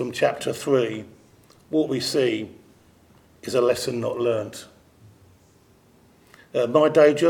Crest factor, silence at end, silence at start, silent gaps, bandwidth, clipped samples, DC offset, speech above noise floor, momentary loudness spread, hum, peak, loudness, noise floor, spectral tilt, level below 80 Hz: 20 dB; 0 s; 0 s; none; 18 kHz; under 0.1%; under 0.1%; 35 dB; 17 LU; none; -4 dBFS; -23 LUFS; -56 dBFS; -5 dB/octave; -64 dBFS